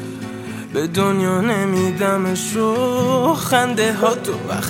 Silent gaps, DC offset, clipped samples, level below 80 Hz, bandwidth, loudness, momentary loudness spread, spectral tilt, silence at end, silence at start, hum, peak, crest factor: none; under 0.1%; under 0.1%; -56 dBFS; 17 kHz; -18 LUFS; 8 LU; -5 dB/octave; 0 s; 0 s; none; -2 dBFS; 16 dB